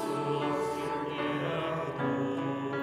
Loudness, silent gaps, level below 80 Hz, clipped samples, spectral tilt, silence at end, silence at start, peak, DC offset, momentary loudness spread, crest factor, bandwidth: -32 LUFS; none; -70 dBFS; under 0.1%; -6.5 dB/octave; 0 s; 0 s; -18 dBFS; under 0.1%; 3 LU; 14 dB; 15 kHz